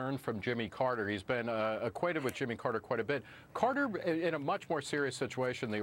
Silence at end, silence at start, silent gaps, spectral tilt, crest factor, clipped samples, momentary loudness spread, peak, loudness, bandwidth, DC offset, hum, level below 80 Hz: 0 s; 0 s; none; -5.5 dB/octave; 18 dB; under 0.1%; 3 LU; -18 dBFS; -35 LUFS; 16 kHz; under 0.1%; none; -70 dBFS